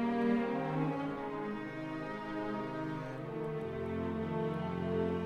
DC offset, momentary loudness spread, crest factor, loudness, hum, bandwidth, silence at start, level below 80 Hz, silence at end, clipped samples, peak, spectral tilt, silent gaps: under 0.1%; 8 LU; 16 dB; -37 LUFS; none; 9.2 kHz; 0 s; -62 dBFS; 0 s; under 0.1%; -20 dBFS; -8.5 dB/octave; none